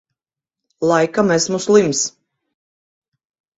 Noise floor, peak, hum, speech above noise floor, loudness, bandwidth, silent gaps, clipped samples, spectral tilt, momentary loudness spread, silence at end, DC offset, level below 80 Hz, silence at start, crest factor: -87 dBFS; 0 dBFS; none; 72 dB; -16 LUFS; 8 kHz; none; under 0.1%; -4 dB/octave; 7 LU; 1.5 s; under 0.1%; -60 dBFS; 0.8 s; 20 dB